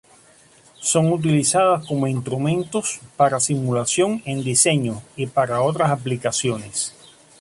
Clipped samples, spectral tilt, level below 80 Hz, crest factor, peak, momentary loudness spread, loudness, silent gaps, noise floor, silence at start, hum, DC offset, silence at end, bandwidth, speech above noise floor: under 0.1%; -4.5 dB/octave; -58 dBFS; 20 dB; -2 dBFS; 9 LU; -20 LUFS; none; -52 dBFS; 0.8 s; none; under 0.1%; 0.5 s; 11.5 kHz; 31 dB